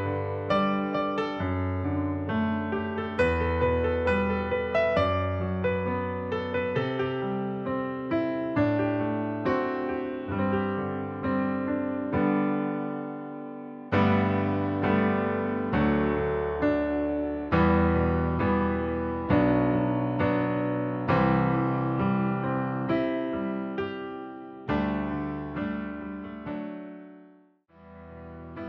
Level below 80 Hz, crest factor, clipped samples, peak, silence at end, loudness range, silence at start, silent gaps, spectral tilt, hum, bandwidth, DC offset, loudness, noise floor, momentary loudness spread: -44 dBFS; 18 dB; under 0.1%; -10 dBFS; 0 s; 6 LU; 0 s; none; -9 dB/octave; none; 6.6 kHz; under 0.1%; -27 LUFS; -58 dBFS; 11 LU